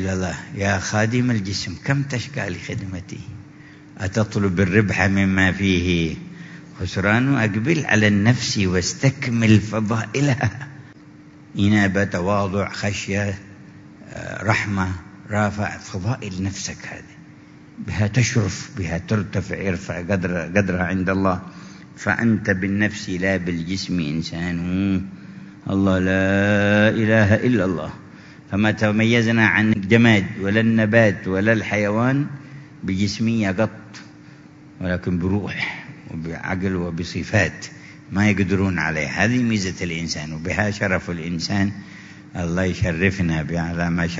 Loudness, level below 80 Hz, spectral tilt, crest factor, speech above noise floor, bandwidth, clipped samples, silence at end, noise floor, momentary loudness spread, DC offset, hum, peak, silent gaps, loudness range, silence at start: -20 LUFS; -46 dBFS; -6 dB/octave; 20 dB; 24 dB; 7.8 kHz; under 0.1%; 0 s; -44 dBFS; 17 LU; under 0.1%; none; 0 dBFS; none; 7 LU; 0 s